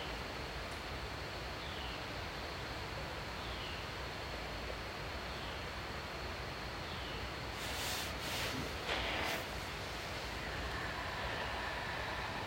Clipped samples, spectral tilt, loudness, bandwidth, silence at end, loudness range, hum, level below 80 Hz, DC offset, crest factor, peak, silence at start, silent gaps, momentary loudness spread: under 0.1%; -3.5 dB/octave; -41 LUFS; 16 kHz; 0 s; 4 LU; none; -52 dBFS; under 0.1%; 18 dB; -24 dBFS; 0 s; none; 5 LU